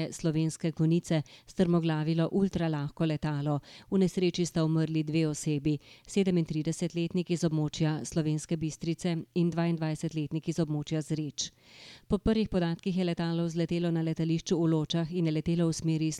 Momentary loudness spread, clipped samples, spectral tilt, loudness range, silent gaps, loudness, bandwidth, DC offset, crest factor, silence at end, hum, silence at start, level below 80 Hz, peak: 6 LU; under 0.1%; -6.5 dB/octave; 2 LU; none; -30 LUFS; 11.5 kHz; under 0.1%; 16 dB; 0 s; none; 0 s; -54 dBFS; -14 dBFS